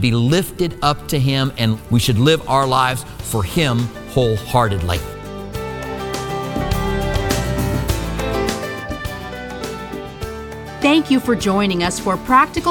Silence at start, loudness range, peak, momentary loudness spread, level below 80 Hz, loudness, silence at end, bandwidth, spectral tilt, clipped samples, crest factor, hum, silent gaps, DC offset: 0 s; 5 LU; 0 dBFS; 14 LU; -32 dBFS; -19 LUFS; 0 s; 19 kHz; -5.5 dB/octave; under 0.1%; 18 dB; none; none; under 0.1%